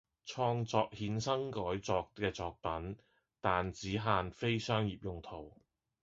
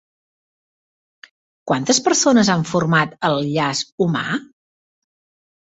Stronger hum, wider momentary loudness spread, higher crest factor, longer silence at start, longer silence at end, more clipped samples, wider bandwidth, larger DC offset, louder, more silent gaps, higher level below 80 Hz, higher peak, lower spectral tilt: neither; first, 13 LU vs 9 LU; about the same, 22 dB vs 18 dB; second, 0.25 s vs 1.65 s; second, 0.55 s vs 1.2 s; neither; about the same, 7.6 kHz vs 8.2 kHz; neither; second, -37 LUFS vs -18 LUFS; second, none vs 3.92-3.98 s; about the same, -58 dBFS vs -58 dBFS; second, -14 dBFS vs -2 dBFS; about the same, -4.5 dB/octave vs -4 dB/octave